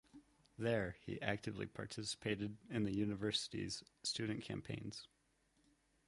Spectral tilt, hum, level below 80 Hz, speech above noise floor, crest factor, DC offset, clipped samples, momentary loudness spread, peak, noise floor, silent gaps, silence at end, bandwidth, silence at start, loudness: -4.5 dB/octave; none; -68 dBFS; 35 dB; 24 dB; under 0.1%; under 0.1%; 8 LU; -20 dBFS; -78 dBFS; none; 1 s; 11.5 kHz; 0.15 s; -43 LUFS